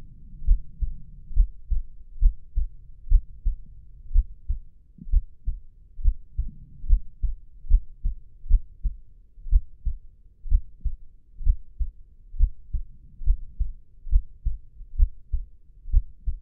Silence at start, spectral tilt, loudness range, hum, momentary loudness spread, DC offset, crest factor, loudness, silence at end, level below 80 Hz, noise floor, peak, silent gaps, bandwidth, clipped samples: 0 s; -15.5 dB/octave; 2 LU; none; 18 LU; under 0.1%; 18 dB; -31 LUFS; 0 s; -26 dBFS; -45 dBFS; -6 dBFS; none; 0.3 kHz; under 0.1%